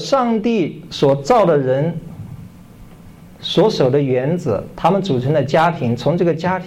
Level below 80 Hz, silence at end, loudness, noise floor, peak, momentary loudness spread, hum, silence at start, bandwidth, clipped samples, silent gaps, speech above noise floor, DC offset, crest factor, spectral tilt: -46 dBFS; 0 s; -16 LUFS; -40 dBFS; -4 dBFS; 12 LU; none; 0 s; 14 kHz; under 0.1%; none; 24 dB; under 0.1%; 12 dB; -7 dB/octave